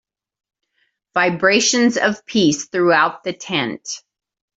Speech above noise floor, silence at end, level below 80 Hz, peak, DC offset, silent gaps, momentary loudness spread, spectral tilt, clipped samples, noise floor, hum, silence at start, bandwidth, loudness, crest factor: 51 dB; 0.6 s; -62 dBFS; -2 dBFS; under 0.1%; none; 14 LU; -3 dB/octave; under 0.1%; -68 dBFS; none; 1.15 s; 8.2 kHz; -17 LUFS; 18 dB